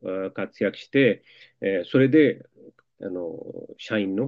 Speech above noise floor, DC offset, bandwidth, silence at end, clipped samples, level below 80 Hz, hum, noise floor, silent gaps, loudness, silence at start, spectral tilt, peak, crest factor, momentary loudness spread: 29 dB; under 0.1%; 7.2 kHz; 0 s; under 0.1%; -74 dBFS; none; -53 dBFS; none; -24 LUFS; 0.05 s; -8 dB/octave; -6 dBFS; 18 dB; 19 LU